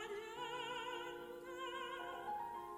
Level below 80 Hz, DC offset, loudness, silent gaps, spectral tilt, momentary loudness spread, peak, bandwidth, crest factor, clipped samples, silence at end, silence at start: -76 dBFS; under 0.1%; -46 LUFS; none; -3 dB/octave; 4 LU; -32 dBFS; 16 kHz; 14 dB; under 0.1%; 0 s; 0 s